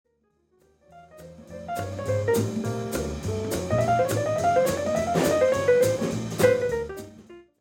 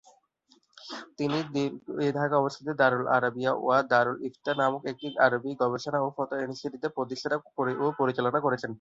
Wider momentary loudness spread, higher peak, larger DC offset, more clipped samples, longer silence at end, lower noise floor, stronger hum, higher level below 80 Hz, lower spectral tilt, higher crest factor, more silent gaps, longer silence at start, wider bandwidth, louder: first, 12 LU vs 9 LU; about the same, -8 dBFS vs -8 dBFS; neither; neither; first, 0.2 s vs 0.05 s; about the same, -68 dBFS vs -66 dBFS; neither; first, -48 dBFS vs -72 dBFS; about the same, -5.5 dB/octave vs -6 dB/octave; about the same, 18 dB vs 20 dB; neither; first, 0.95 s vs 0.75 s; first, 17 kHz vs 7.8 kHz; first, -25 LUFS vs -28 LUFS